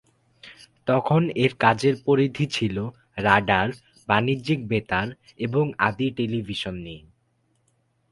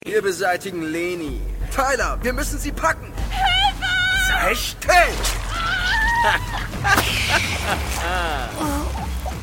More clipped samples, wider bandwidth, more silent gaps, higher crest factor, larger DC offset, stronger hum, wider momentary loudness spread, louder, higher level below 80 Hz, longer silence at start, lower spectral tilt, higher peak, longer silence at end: neither; second, 11.5 kHz vs 17 kHz; neither; first, 24 dB vs 18 dB; neither; neither; first, 13 LU vs 9 LU; second, -23 LUFS vs -20 LUFS; second, -52 dBFS vs -28 dBFS; first, 0.45 s vs 0.05 s; first, -6.5 dB/octave vs -3 dB/octave; about the same, 0 dBFS vs -2 dBFS; first, 1.15 s vs 0 s